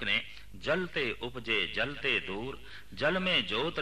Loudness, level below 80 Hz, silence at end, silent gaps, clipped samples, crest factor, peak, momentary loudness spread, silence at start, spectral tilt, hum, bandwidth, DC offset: -31 LUFS; -54 dBFS; 0 s; none; under 0.1%; 16 dB; -16 dBFS; 13 LU; 0 s; -4.5 dB/octave; none; 14 kHz; 0.5%